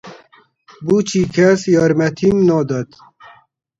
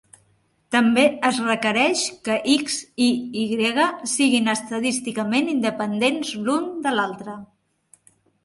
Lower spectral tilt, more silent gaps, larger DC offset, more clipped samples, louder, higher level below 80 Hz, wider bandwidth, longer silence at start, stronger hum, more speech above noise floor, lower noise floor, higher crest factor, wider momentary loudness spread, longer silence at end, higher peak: first, -6.5 dB/octave vs -3 dB/octave; neither; neither; neither; first, -15 LUFS vs -21 LUFS; first, -50 dBFS vs -66 dBFS; second, 8 kHz vs 11.5 kHz; second, 0.05 s vs 0.7 s; neither; second, 36 dB vs 42 dB; second, -50 dBFS vs -64 dBFS; about the same, 16 dB vs 18 dB; first, 10 LU vs 7 LU; about the same, 0.95 s vs 1 s; first, 0 dBFS vs -4 dBFS